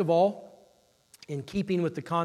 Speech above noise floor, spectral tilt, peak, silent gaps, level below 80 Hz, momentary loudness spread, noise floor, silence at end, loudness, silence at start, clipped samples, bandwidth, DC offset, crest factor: 36 dB; -7.5 dB/octave; -14 dBFS; none; -64 dBFS; 14 LU; -64 dBFS; 0 s; -29 LUFS; 0 s; under 0.1%; 13.5 kHz; under 0.1%; 16 dB